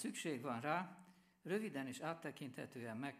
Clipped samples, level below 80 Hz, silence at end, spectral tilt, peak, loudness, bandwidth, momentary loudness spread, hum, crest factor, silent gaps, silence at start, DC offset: under 0.1%; -90 dBFS; 0 s; -5 dB/octave; -24 dBFS; -45 LUFS; 15.5 kHz; 10 LU; none; 22 dB; none; 0 s; under 0.1%